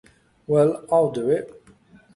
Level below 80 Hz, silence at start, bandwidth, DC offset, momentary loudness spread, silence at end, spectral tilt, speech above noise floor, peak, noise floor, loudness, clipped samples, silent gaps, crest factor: -62 dBFS; 0.5 s; 11.5 kHz; under 0.1%; 6 LU; 0.65 s; -8 dB/octave; 32 dB; -6 dBFS; -53 dBFS; -21 LUFS; under 0.1%; none; 16 dB